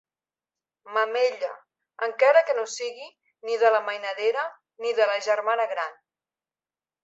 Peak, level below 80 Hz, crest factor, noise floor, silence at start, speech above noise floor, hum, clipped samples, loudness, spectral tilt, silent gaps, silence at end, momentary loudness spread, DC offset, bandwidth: -6 dBFS; -84 dBFS; 20 dB; under -90 dBFS; 0.85 s; over 66 dB; none; under 0.1%; -25 LUFS; 0.5 dB/octave; none; 1.1 s; 14 LU; under 0.1%; 8 kHz